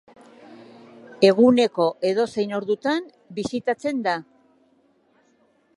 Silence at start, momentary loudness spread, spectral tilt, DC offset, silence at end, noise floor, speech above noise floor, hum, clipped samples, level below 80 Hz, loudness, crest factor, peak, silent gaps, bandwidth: 0.5 s; 12 LU; -5.5 dB/octave; under 0.1%; 1.55 s; -62 dBFS; 41 dB; none; under 0.1%; -66 dBFS; -22 LUFS; 20 dB; -4 dBFS; none; 11.5 kHz